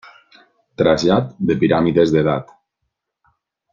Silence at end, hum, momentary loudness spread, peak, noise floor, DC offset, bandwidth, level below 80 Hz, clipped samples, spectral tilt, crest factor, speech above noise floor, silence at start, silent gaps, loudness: 1.3 s; none; 6 LU; -2 dBFS; -76 dBFS; under 0.1%; 7.4 kHz; -50 dBFS; under 0.1%; -7 dB/octave; 18 dB; 60 dB; 0.8 s; none; -17 LUFS